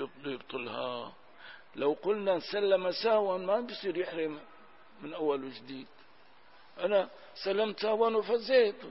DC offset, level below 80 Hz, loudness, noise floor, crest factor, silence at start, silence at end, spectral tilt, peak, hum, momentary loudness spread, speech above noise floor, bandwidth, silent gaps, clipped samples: 0.1%; -76 dBFS; -31 LUFS; -61 dBFS; 18 dB; 0 s; 0 s; -7.5 dB/octave; -14 dBFS; none; 18 LU; 30 dB; 6 kHz; none; under 0.1%